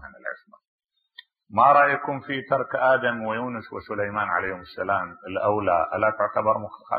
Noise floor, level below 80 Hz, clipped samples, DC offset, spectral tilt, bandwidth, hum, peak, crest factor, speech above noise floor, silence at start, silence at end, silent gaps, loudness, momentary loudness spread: -52 dBFS; -62 dBFS; under 0.1%; under 0.1%; -9.5 dB/octave; 4.9 kHz; none; -6 dBFS; 20 dB; 29 dB; 0 s; 0 s; 0.68-0.79 s; -23 LUFS; 14 LU